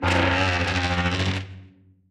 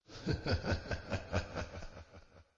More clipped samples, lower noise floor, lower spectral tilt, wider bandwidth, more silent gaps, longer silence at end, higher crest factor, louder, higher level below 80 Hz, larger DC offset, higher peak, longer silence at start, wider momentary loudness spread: neither; second, -51 dBFS vs -59 dBFS; about the same, -5 dB/octave vs -6 dB/octave; first, 10.5 kHz vs 7.6 kHz; neither; first, 0.4 s vs 0.15 s; about the same, 16 dB vs 18 dB; first, -23 LUFS vs -39 LUFS; first, -40 dBFS vs -50 dBFS; neither; first, -8 dBFS vs -20 dBFS; about the same, 0 s vs 0.1 s; second, 9 LU vs 19 LU